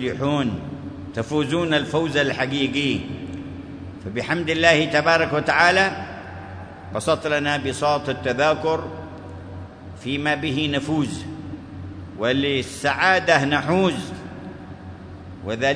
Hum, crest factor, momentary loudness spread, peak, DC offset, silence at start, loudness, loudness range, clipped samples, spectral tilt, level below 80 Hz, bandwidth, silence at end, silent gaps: none; 22 dB; 20 LU; 0 dBFS; under 0.1%; 0 s; -21 LUFS; 5 LU; under 0.1%; -5 dB/octave; -50 dBFS; 11 kHz; 0 s; none